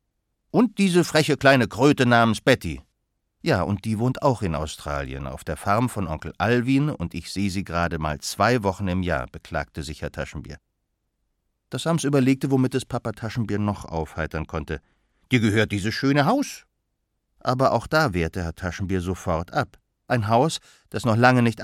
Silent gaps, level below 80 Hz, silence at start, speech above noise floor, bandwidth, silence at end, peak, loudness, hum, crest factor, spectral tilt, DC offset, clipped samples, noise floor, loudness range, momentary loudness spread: none; -44 dBFS; 0.55 s; 53 dB; 16 kHz; 0 s; -2 dBFS; -23 LUFS; none; 22 dB; -6 dB/octave; under 0.1%; under 0.1%; -76 dBFS; 6 LU; 14 LU